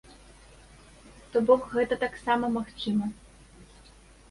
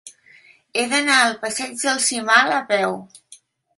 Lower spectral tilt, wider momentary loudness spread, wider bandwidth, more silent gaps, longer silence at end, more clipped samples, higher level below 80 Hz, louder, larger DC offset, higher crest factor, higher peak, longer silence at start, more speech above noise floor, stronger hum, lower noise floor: first, -6 dB/octave vs -1 dB/octave; about the same, 8 LU vs 10 LU; about the same, 11.5 kHz vs 12 kHz; neither; first, 0.65 s vs 0.45 s; neither; first, -56 dBFS vs -70 dBFS; second, -27 LUFS vs -18 LUFS; neither; about the same, 22 dB vs 20 dB; second, -8 dBFS vs -2 dBFS; first, 1.35 s vs 0.05 s; second, 27 dB vs 32 dB; neither; about the same, -54 dBFS vs -51 dBFS